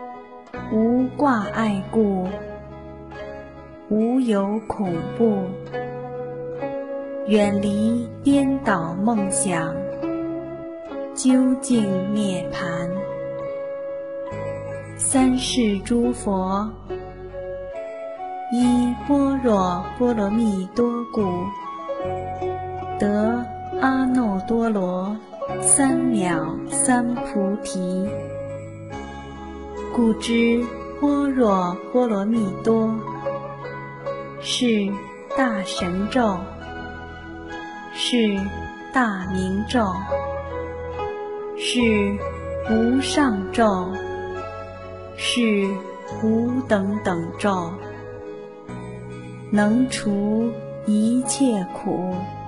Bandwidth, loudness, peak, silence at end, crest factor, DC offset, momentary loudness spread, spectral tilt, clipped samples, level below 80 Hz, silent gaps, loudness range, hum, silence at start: 11.5 kHz; -22 LUFS; -2 dBFS; 0 s; 20 dB; under 0.1%; 15 LU; -5 dB/octave; under 0.1%; -46 dBFS; none; 4 LU; none; 0 s